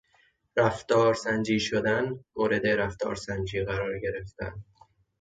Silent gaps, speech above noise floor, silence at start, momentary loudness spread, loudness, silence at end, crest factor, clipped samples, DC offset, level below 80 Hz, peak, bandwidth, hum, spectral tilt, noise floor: none; 39 dB; 0.55 s; 12 LU; -28 LUFS; 0.6 s; 18 dB; under 0.1%; under 0.1%; -52 dBFS; -10 dBFS; 9.2 kHz; none; -5.5 dB/octave; -66 dBFS